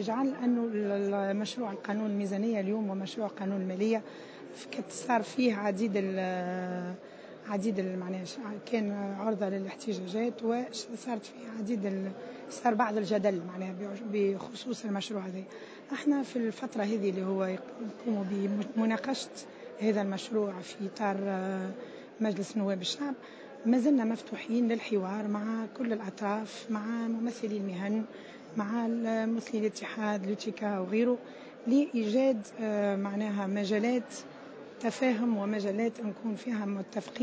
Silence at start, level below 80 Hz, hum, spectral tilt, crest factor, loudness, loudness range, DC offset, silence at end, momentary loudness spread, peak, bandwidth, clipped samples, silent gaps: 0 s; -86 dBFS; none; -6 dB/octave; 20 dB; -33 LUFS; 4 LU; under 0.1%; 0 s; 11 LU; -14 dBFS; 8 kHz; under 0.1%; none